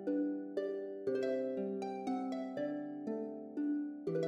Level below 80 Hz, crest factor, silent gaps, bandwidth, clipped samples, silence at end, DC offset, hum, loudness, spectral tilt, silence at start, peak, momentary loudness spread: -84 dBFS; 14 dB; none; 9 kHz; under 0.1%; 0 s; under 0.1%; none; -39 LUFS; -7.5 dB/octave; 0 s; -24 dBFS; 5 LU